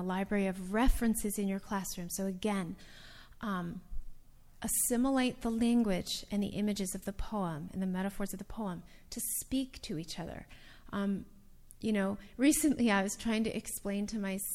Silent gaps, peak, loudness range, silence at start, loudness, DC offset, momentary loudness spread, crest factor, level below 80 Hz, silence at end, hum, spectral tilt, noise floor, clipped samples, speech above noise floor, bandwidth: none; -16 dBFS; 6 LU; 0 s; -34 LUFS; under 0.1%; 14 LU; 18 dB; -46 dBFS; 0 s; none; -4.5 dB/octave; -53 dBFS; under 0.1%; 20 dB; 17 kHz